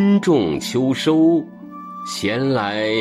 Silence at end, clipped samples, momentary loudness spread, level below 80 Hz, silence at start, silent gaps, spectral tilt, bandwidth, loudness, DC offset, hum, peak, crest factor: 0 s; under 0.1%; 17 LU; -54 dBFS; 0 s; none; -5.5 dB/octave; 13.5 kHz; -18 LUFS; under 0.1%; none; -6 dBFS; 12 dB